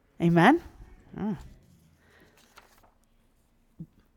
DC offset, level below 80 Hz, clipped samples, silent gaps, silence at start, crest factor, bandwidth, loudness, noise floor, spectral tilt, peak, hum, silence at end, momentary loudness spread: under 0.1%; -56 dBFS; under 0.1%; none; 0.2 s; 24 dB; 12.5 kHz; -25 LUFS; -65 dBFS; -7.5 dB/octave; -6 dBFS; none; 0.35 s; 29 LU